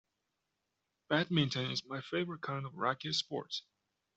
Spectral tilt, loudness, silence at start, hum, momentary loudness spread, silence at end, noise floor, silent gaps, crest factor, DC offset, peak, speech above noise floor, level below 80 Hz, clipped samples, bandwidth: -5 dB/octave; -36 LUFS; 1.1 s; none; 8 LU; 0.55 s; -86 dBFS; none; 22 dB; under 0.1%; -16 dBFS; 50 dB; -74 dBFS; under 0.1%; 8.2 kHz